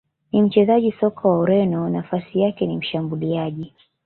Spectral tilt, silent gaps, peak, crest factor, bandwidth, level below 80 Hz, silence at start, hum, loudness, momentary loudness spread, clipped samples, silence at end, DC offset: -11.5 dB/octave; none; -4 dBFS; 16 dB; 4.3 kHz; -58 dBFS; 0.35 s; none; -20 LUFS; 9 LU; under 0.1%; 0.4 s; under 0.1%